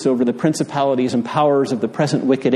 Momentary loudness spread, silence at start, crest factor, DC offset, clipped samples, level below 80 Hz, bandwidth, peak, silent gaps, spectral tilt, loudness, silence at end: 3 LU; 0 s; 14 dB; under 0.1%; under 0.1%; -64 dBFS; 12.5 kHz; -2 dBFS; none; -6 dB/octave; -18 LUFS; 0 s